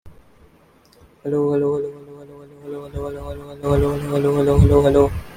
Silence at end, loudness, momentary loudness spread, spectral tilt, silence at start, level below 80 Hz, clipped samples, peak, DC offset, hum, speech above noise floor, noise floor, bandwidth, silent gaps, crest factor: 0 s; -18 LUFS; 21 LU; -8.5 dB/octave; 0.05 s; -32 dBFS; under 0.1%; -2 dBFS; under 0.1%; none; 35 dB; -53 dBFS; 16 kHz; none; 18 dB